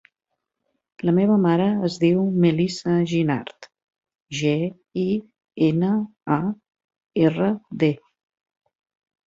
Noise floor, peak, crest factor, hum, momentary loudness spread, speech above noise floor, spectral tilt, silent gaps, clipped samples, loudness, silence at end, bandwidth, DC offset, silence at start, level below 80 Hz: -76 dBFS; -4 dBFS; 18 dB; none; 10 LU; 56 dB; -7.5 dB/octave; 3.84-3.88 s, 4.15-4.19 s, 6.84-6.88 s; under 0.1%; -22 LUFS; 1.3 s; 7.8 kHz; under 0.1%; 1.05 s; -62 dBFS